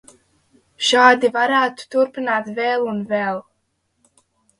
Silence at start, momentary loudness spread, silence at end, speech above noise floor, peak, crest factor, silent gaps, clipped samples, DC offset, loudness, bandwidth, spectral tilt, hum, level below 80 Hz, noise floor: 0.8 s; 9 LU; 1.2 s; 52 dB; 0 dBFS; 20 dB; none; under 0.1%; under 0.1%; -18 LUFS; 11.5 kHz; -3 dB/octave; none; -68 dBFS; -69 dBFS